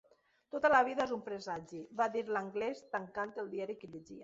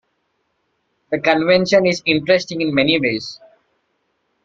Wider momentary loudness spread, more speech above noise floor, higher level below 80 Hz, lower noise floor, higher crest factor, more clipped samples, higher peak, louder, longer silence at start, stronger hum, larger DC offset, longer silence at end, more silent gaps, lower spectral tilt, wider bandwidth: first, 15 LU vs 10 LU; second, 21 dB vs 52 dB; second, -74 dBFS vs -58 dBFS; second, -57 dBFS vs -69 dBFS; about the same, 20 dB vs 18 dB; neither; second, -16 dBFS vs -2 dBFS; second, -36 LUFS vs -16 LUFS; second, 0.55 s vs 1.1 s; neither; neither; second, 0 s vs 1.1 s; neither; second, -3 dB/octave vs -5 dB/octave; about the same, 7.8 kHz vs 7.6 kHz